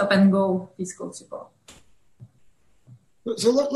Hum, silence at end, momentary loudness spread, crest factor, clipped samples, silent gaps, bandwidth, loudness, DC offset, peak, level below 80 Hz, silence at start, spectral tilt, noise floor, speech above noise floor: none; 0 s; 21 LU; 18 dB; under 0.1%; none; 12 kHz; -23 LUFS; under 0.1%; -6 dBFS; -64 dBFS; 0 s; -6 dB/octave; -61 dBFS; 39 dB